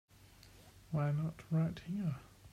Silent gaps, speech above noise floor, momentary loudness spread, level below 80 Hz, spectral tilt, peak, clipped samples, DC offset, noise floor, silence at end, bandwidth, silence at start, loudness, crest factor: none; 24 dB; 16 LU; -64 dBFS; -8.5 dB/octave; -26 dBFS; under 0.1%; under 0.1%; -61 dBFS; 0.05 s; 13.5 kHz; 0.45 s; -38 LUFS; 14 dB